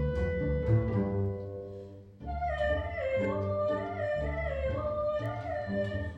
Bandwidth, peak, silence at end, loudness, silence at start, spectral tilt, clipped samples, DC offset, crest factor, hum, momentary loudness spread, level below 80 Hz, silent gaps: 7.8 kHz; -14 dBFS; 0 s; -32 LUFS; 0 s; -9 dB/octave; under 0.1%; under 0.1%; 16 dB; none; 12 LU; -42 dBFS; none